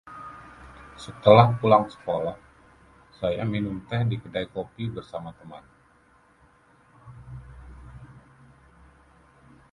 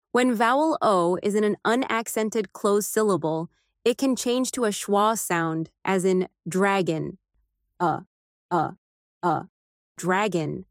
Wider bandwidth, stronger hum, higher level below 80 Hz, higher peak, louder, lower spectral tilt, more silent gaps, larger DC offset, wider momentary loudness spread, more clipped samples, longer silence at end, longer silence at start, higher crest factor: second, 11 kHz vs 16.5 kHz; neither; first, -52 dBFS vs -68 dBFS; first, 0 dBFS vs -8 dBFS; about the same, -23 LUFS vs -24 LUFS; first, -8 dB/octave vs -4.5 dB/octave; second, none vs 8.07-8.49 s, 8.78-9.21 s, 9.49-9.95 s; neither; first, 29 LU vs 8 LU; neither; first, 1.65 s vs 0.1 s; about the same, 0.05 s vs 0.15 s; first, 26 dB vs 18 dB